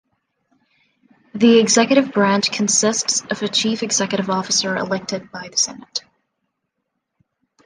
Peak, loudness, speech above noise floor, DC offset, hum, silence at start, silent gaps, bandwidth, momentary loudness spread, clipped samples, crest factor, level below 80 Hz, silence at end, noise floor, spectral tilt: -2 dBFS; -17 LUFS; 58 dB; under 0.1%; none; 1.35 s; none; 10.5 kHz; 14 LU; under 0.1%; 18 dB; -64 dBFS; 1.65 s; -76 dBFS; -2.5 dB/octave